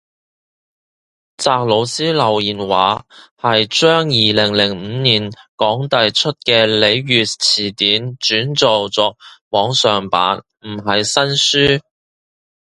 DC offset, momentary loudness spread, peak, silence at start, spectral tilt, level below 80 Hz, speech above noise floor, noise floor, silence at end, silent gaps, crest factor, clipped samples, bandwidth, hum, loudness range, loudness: under 0.1%; 7 LU; 0 dBFS; 1.4 s; -3.5 dB/octave; -50 dBFS; over 75 dB; under -90 dBFS; 0.8 s; 3.31-3.36 s, 5.48-5.58 s, 9.41-9.51 s; 16 dB; under 0.1%; 11.5 kHz; none; 2 LU; -14 LUFS